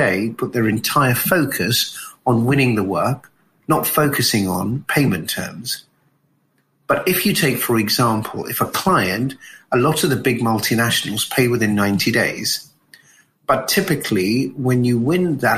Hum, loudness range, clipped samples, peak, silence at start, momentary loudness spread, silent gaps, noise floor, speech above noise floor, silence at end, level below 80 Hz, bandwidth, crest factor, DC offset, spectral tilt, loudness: none; 2 LU; under 0.1%; -2 dBFS; 0 s; 8 LU; none; -63 dBFS; 45 dB; 0 s; -52 dBFS; 15.5 kHz; 16 dB; under 0.1%; -4.5 dB/octave; -18 LUFS